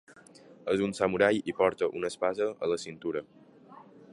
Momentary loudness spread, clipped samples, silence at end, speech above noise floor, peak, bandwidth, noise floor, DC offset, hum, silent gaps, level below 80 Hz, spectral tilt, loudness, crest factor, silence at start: 10 LU; under 0.1%; 0 s; 25 dB; -10 dBFS; 11.5 kHz; -54 dBFS; under 0.1%; none; none; -66 dBFS; -5 dB/octave; -30 LUFS; 22 dB; 0.1 s